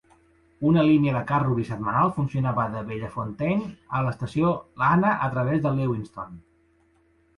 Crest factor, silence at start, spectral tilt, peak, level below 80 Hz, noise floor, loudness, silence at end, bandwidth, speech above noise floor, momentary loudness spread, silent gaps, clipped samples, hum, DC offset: 16 dB; 0.6 s; -9 dB/octave; -8 dBFS; -52 dBFS; -63 dBFS; -24 LUFS; 0.95 s; 11 kHz; 39 dB; 12 LU; none; under 0.1%; none; under 0.1%